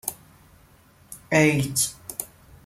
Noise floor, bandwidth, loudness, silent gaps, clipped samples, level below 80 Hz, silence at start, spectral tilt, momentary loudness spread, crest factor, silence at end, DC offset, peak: -55 dBFS; 16.5 kHz; -23 LUFS; none; under 0.1%; -56 dBFS; 0.05 s; -4 dB/octave; 24 LU; 22 dB; 0.4 s; under 0.1%; -4 dBFS